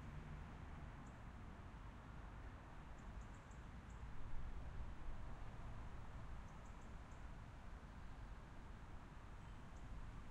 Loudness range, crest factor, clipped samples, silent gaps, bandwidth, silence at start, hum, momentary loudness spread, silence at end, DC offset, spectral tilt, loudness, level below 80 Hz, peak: 2 LU; 16 dB; under 0.1%; none; 10 kHz; 0 s; none; 4 LU; 0 s; under 0.1%; -6.5 dB/octave; -57 LUFS; -56 dBFS; -36 dBFS